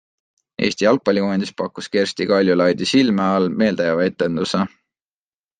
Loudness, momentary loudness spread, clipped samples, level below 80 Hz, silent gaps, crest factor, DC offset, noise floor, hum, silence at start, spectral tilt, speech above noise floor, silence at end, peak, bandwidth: -19 LUFS; 7 LU; under 0.1%; -60 dBFS; none; 16 dB; under 0.1%; under -90 dBFS; none; 0.6 s; -5.5 dB/octave; over 72 dB; 0.9 s; -2 dBFS; 9.6 kHz